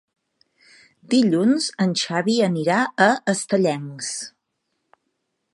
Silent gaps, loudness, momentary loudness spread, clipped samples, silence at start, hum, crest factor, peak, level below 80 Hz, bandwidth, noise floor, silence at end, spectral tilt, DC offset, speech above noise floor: none; -20 LUFS; 11 LU; under 0.1%; 1.1 s; none; 22 dB; -2 dBFS; -72 dBFS; 11.5 kHz; -75 dBFS; 1.25 s; -4.5 dB/octave; under 0.1%; 55 dB